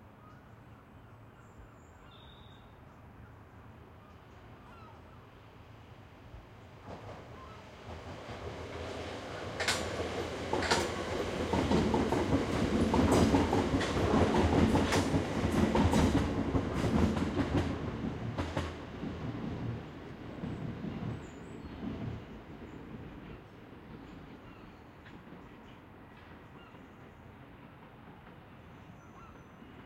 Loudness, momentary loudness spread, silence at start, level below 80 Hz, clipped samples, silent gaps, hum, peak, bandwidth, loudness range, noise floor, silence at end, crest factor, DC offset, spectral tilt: -32 LUFS; 26 LU; 0 s; -48 dBFS; under 0.1%; none; none; -12 dBFS; 15.5 kHz; 25 LU; -54 dBFS; 0 s; 22 dB; under 0.1%; -6 dB/octave